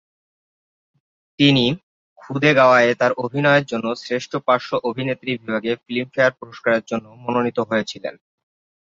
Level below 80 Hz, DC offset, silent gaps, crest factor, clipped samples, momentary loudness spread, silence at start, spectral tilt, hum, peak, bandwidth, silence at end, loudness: -62 dBFS; under 0.1%; 1.83-2.16 s; 18 dB; under 0.1%; 12 LU; 1.4 s; -5.5 dB/octave; none; -2 dBFS; 7.8 kHz; 0.75 s; -19 LUFS